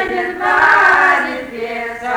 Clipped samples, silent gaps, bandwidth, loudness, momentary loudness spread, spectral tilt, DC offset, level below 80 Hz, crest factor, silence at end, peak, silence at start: under 0.1%; none; over 20 kHz; -12 LUFS; 14 LU; -3.5 dB/octave; under 0.1%; -48 dBFS; 14 dB; 0 s; -2 dBFS; 0 s